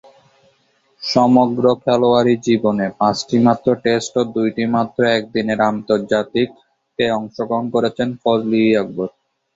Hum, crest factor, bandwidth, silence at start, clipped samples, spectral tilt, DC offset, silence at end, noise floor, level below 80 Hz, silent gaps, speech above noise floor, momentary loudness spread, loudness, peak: none; 16 dB; 7.8 kHz; 1 s; under 0.1%; -6 dB/octave; under 0.1%; 0.45 s; -60 dBFS; -56 dBFS; none; 44 dB; 8 LU; -17 LUFS; -2 dBFS